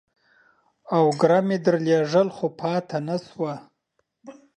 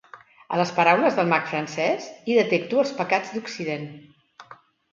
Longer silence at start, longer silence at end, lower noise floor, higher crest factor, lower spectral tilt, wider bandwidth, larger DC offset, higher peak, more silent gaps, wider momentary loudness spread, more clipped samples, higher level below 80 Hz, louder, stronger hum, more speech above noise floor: first, 0.9 s vs 0.15 s; second, 0.25 s vs 0.4 s; first, -74 dBFS vs -50 dBFS; about the same, 18 dB vs 20 dB; first, -7 dB/octave vs -5 dB/octave; first, 9.6 kHz vs 7.6 kHz; neither; about the same, -4 dBFS vs -4 dBFS; neither; about the same, 11 LU vs 11 LU; neither; about the same, -70 dBFS vs -72 dBFS; about the same, -23 LUFS vs -23 LUFS; neither; first, 52 dB vs 27 dB